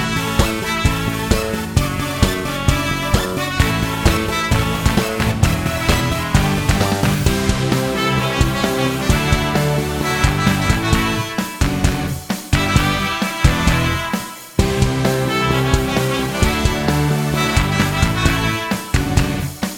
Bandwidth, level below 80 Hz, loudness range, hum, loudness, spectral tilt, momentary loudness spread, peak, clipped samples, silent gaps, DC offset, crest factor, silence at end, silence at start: 19.5 kHz; -24 dBFS; 1 LU; none; -18 LUFS; -5 dB/octave; 4 LU; 0 dBFS; under 0.1%; none; under 0.1%; 16 dB; 0 s; 0 s